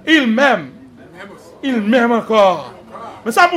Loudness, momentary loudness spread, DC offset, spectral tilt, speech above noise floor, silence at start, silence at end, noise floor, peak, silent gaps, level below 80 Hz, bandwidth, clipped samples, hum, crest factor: -14 LUFS; 23 LU; under 0.1%; -4.5 dB/octave; 24 dB; 0.05 s; 0 s; -37 dBFS; 0 dBFS; none; -58 dBFS; 16 kHz; under 0.1%; none; 16 dB